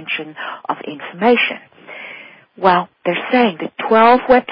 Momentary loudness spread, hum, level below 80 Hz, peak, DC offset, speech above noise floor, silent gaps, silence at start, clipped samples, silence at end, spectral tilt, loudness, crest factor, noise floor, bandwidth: 21 LU; none; -54 dBFS; 0 dBFS; under 0.1%; 22 dB; none; 0 s; under 0.1%; 0 s; -10 dB/octave; -15 LUFS; 16 dB; -38 dBFS; 5.2 kHz